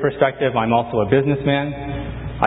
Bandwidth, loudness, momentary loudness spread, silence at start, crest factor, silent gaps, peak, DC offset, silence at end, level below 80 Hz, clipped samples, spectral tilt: 4 kHz; -20 LUFS; 10 LU; 0 s; 18 dB; none; 0 dBFS; under 0.1%; 0 s; -38 dBFS; under 0.1%; -9.5 dB/octave